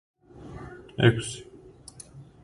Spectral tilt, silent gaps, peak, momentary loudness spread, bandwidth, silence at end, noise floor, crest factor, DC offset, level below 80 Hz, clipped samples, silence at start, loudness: -5.5 dB/octave; none; -6 dBFS; 25 LU; 11.5 kHz; 0.2 s; -48 dBFS; 24 dB; under 0.1%; -54 dBFS; under 0.1%; 0.35 s; -25 LUFS